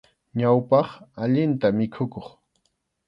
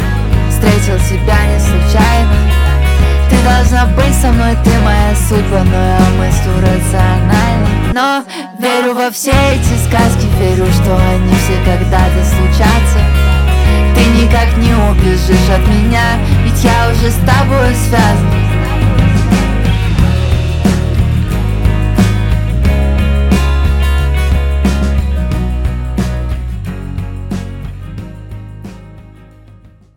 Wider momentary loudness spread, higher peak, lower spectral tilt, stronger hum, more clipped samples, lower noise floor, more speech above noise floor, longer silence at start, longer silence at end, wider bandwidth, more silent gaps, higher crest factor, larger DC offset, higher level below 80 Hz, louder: first, 13 LU vs 8 LU; second, -6 dBFS vs 0 dBFS; first, -10 dB/octave vs -6 dB/octave; neither; neither; first, -73 dBFS vs -39 dBFS; first, 51 dB vs 30 dB; first, 0.35 s vs 0 s; about the same, 0.8 s vs 0.9 s; second, 5.8 kHz vs 17 kHz; neither; first, 18 dB vs 10 dB; neither; second, -62 dBFS vs -14 dBFS; second, -23 LUFS vs -11 LUFS